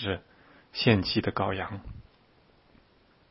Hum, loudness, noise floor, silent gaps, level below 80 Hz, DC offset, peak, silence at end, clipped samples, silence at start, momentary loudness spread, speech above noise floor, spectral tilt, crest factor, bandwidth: none; -28 LUFS; -62 dBFS; none; -54 dBFS; under 0.1%; -8 dBFS; 1.3 s; under 0.1%; 0 s; 20 LU; 34 dB; -9.5 dB/octave; 24 dB; 5.8 kHz